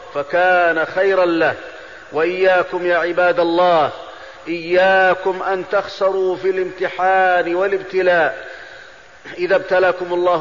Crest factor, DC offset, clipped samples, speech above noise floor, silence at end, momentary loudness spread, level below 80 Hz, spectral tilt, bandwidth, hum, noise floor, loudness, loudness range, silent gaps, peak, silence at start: 12 dB; 0.3%; under 0.1%; 25 dB; 0 s; 17 LU; -58 dBFS; -5.5 dB/octave; 7.4 kHz; none; -41 dBFS; -16 LUFS; 2 LU; none; -4 dBFS; 0 s